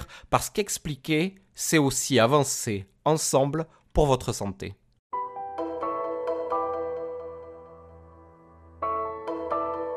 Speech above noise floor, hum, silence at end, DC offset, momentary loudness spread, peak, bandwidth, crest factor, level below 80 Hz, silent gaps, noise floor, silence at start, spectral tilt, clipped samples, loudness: 27 dB; none; 0 s; under 0.1%; 13 LU; -6 dBFS; 15.5 kHz; 22 dB; -44 dBFS; 4.99-5.10 s; -52 dBFS; 0 s; -4.5 dB/octave; under 0.1%; -27 LUFS